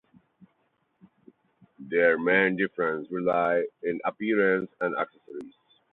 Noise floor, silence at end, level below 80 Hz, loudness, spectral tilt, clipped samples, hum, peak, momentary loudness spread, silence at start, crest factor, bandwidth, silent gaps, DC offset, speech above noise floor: -72 dBFS; 0.45 s; -72 dBFS; -26 LUFS; -8.5 dB/octave; under 0.1%; none; -10 dBFS; 11 LU; 1.8 s; 20 dB; 4.2 kHz; none; under 0.1%; 47 dB